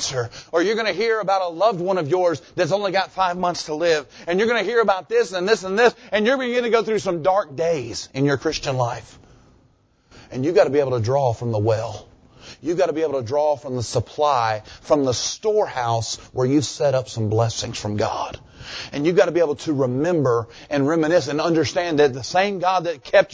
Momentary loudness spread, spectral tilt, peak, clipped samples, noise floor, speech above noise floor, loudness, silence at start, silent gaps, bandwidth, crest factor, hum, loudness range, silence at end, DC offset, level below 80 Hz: 7 LU; -5 dB/octave; -2 dBFS; under 0.1%; -59 dBFS; 38 dB; -21 LUFS; 0 s; none; 8 kHz; 18 dB; none; 3 LU; 0 s; under 0.1%; -52 dBFS